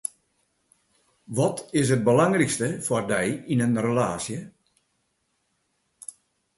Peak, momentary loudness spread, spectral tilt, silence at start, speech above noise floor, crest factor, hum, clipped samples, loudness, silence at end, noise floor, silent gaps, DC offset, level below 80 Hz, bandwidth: -6 dBFS; 18 LU; -5.5 dB/octave; 1.3 s; 50 dB; 20 dB; none; under 0.1%; -24 LUFS; 2.1 s; -73 dBFS; none; under 0.1%; -60 dBFS; 12 kHz